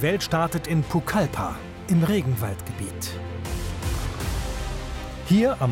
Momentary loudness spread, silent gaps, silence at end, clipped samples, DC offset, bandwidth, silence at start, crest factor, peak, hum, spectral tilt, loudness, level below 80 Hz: 12 LU; none; 0 s; under 0.1%; under 0.1%; 16.5 kHz; 0 s; 16 dB; -10 dBFS; none; -6 dB/octave; -26 LUFS; -36 dBFS